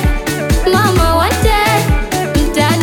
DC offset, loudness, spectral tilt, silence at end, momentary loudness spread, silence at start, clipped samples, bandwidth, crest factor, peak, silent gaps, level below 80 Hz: under 0.1%; -13 LUFS; -5 dB/octave; 0 s; 5 LU; 0 s; under 0.1%; 18.5 kHz; 12 dB; 0 dBFS; none; -18 dBFS